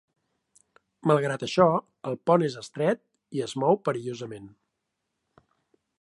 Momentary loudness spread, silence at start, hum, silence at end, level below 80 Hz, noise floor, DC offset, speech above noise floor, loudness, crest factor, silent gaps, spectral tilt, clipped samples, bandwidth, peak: 14 LU; 1.05 s; none; 1.5 s; -68 dBFS; -81 dBFS; under 0.1%; 56 dB; -26 LUFS; 24 dB; none; -6.5 dB/octave; under 0.1%; 11.5 kHz; -4 dBFS